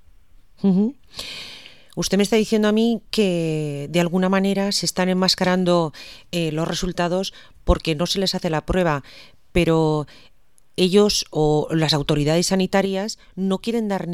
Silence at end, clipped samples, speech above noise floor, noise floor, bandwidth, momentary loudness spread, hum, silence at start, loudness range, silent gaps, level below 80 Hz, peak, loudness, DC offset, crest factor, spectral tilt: 0 s; under 0.1%; 31 dB; -51 dBFS; 15 kHz; 12 LU; none; 0.65 s; 3 LU; none; -38 dBFS; -2 dBFS; -21 LUFS; 0.4%; 18 dB; -5 dB/octave